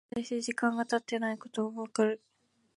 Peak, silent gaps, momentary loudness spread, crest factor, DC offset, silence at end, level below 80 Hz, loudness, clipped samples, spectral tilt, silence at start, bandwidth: -16 dBFS; none; 5 LU; 18 dB; under 0.1%; 0.6 s; -76 dBFS; -33 LUFS; under 0.1%; -4 dB/octave; 0.15 s; 11.5 kHz